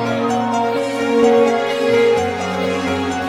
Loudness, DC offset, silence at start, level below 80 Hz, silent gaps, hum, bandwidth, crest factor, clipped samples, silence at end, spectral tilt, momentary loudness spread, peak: -16 LUFS; under 0.1%; 0 s; -52 dBFS; none; none; 14 kHz; 14 dB; under 0.1%; 0 s; -5 dB/octave; 6 LU; -2 dBFS